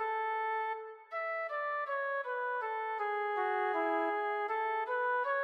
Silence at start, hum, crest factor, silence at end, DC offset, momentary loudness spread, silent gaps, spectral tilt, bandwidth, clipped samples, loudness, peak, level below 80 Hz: 0 s; none; 12 dB; 0 s; under 0.1%; 4 LU; none; -2.5 dB/octave; 9.2 kHz; under 0.1%; -35 LUFS; -22 dBFS; under -90 dBFS